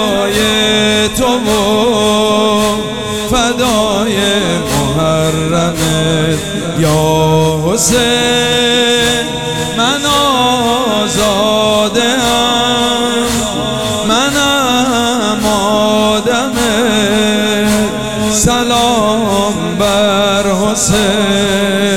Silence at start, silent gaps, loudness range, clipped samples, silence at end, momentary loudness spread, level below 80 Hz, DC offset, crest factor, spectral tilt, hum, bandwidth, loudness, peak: 0 s; none; 2 LU; under 0.1%; 0 s; 4 LU; -34 dBFS; 1%; 12 dB; -3.5 dB/octave; none; 16.5 kHz; -11 LUFS; 0 dBFS